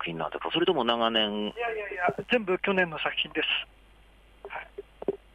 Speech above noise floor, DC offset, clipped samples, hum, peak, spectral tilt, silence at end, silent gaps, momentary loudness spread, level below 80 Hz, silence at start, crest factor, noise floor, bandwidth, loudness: 28 dB; under 0.1%; under 0.1%; none; -10 dBFS; -6 dB/octave; 0.2 s; none; 15 LU; -58 dBFS; 0 s; 20 dB; -56 dBFS; 9.8 kHz; -28 LUFS